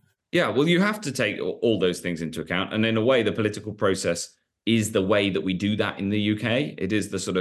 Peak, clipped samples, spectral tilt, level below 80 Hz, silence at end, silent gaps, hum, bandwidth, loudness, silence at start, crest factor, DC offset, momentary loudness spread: -8 dBFS; under 0.1%; -5 dB/octave; -54 dBFS; 0 s; none; none; 12.5 kHz; -24 LUFS; 0.35 s; 16 dB; under 0.1%; 7 LU